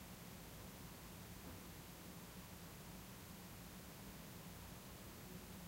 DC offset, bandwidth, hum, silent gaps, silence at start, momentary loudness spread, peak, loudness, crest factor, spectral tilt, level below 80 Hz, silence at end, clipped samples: under 0.1%; 16 kHz; none; none; 0 s; 1 LU; -42 dBFS; -55 LUFS; 14 dB; -4 dB/octave; -66 dBFS; 0 s; under 0.1%